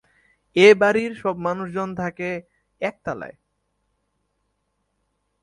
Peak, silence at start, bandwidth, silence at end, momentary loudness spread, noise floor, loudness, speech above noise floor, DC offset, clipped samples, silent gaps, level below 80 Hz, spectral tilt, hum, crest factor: -2 dBFS; 0.55 s; 11 kHz; 2.1 s; 18 LU; -73 dBFS; -21 LUFS; 53 dB; under 0.1%; under 0.1%; none; -60 dBFS; -5.5 dB/octave; none; 22 dB